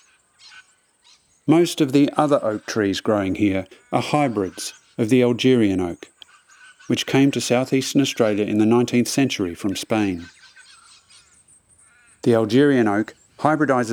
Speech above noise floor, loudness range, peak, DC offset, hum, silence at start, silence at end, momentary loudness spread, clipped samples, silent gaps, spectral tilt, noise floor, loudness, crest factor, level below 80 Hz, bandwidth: 39 dB; 3 LU; -2 dBFS; under 0.1%; none; 0.55 s; 0 s; 9 LU; under 0.1%; none; -5.5 dB/octave; -58 dBFS; -20 LUFS; 20 dB; -66 dBFS; 17.5 kHz